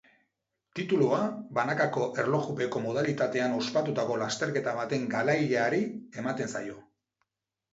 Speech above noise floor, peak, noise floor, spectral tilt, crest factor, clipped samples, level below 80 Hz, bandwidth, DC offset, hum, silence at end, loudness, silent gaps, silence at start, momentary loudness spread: 52 dB; -12 dBFS; -81 dBFS; -5.5 dB/octave; 16 dB; under 0.1%; -72 dBFS; 8 kHz; under 0.1%; none; 0.9 s; -29 LUFS; none; 0.75 s; 9 LU